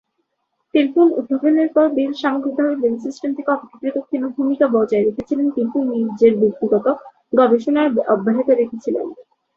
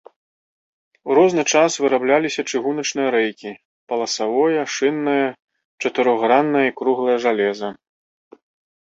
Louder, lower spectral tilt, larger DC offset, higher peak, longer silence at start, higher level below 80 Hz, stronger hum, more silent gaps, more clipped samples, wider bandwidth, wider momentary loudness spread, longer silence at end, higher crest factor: about the same, -18 LUFS vs -19 LUFS; first, -7.5 dB/octave vs -3.5 dB/octave; neither; about the same, -2 dBFS vs -2 dBFS; second, 0.75 s vs 1.05 s; first, -62 dBFS vs -68 dBFS; neither; second, none vs 3.65-3.87 s, 5.42-5.48 s, 5.65-5.78 s; neither; second, 7.2 kHz vs 8 kHz; about the same, 9 LU vs 10 LU; second, 0.35 s vs 1.05 s; about the same, 16 dB vs 18 dB